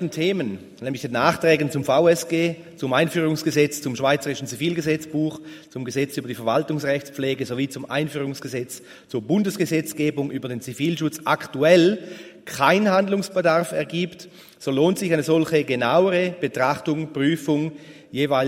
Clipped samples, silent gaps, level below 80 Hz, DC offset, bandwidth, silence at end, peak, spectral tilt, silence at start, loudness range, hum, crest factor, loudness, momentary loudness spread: under 0.1%; none; -64 dBFS; under 0.1%; 16 kHz; 0 s; -2 dBFS; -5.5 dB/octave; 0 s; 5 LU; none; 20 dB; -22 LUFS; 13 LU